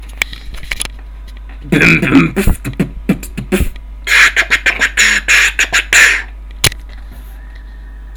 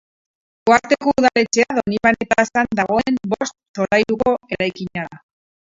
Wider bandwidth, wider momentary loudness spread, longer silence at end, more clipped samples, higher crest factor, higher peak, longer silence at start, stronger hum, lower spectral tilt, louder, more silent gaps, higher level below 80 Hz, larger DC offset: first, over 20 kHz vs 7.8 kHz; first, 16 LU vs 10 LU; second, 0 s vs 0.55 s; first, 0.2% vs under 0.1%; about the same, 14 dB vs 18 dB; about the same, 0 dBFS vs 0 dBFS; second, 0 s vs 0.65 s; neither; second, -3 dB/octave vs -4.5 dB/octave; first, -11 LUFS vs -18 LUFS; second, none vs 3.68-3.74 s; first, -24 dBFS vs -50 dBFS; neither